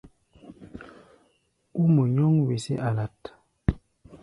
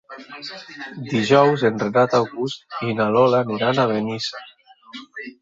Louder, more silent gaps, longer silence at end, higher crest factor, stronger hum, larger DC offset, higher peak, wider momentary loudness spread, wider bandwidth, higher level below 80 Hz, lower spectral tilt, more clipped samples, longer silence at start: second, -25 LUFS vs -19 LUFS; neither; about the same, 0.05 s vs 0.1 s; about the same, 22 dB vs 20 dB; neither; neither; second, -6 dBFS vs -2 dBFS; first, 24 LU vs 20 LU; first, 11 kHz vs 7.8 kHz; first, -44 dBFS vs -62 dBFS; first, -8.5 dB/octave vs -6 dB/octave; neither; about the same, 0.05 s vs 0.1 s